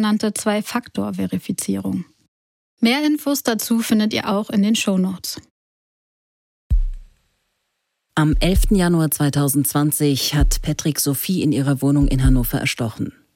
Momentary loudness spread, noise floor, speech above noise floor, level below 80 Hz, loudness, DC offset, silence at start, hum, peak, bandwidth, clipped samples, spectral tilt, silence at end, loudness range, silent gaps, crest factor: 8 LU; -74 dBFS; 56 dB; -28 dBFS; -19 LUFS; under 0.1%; 0 s; none; -4 dBFS; 17 kHz; under 0.1%; -5 dB/octave; 0.25 s; 6 LU; 2.28-2.77 s, 5.50-6.70 s; 16 dB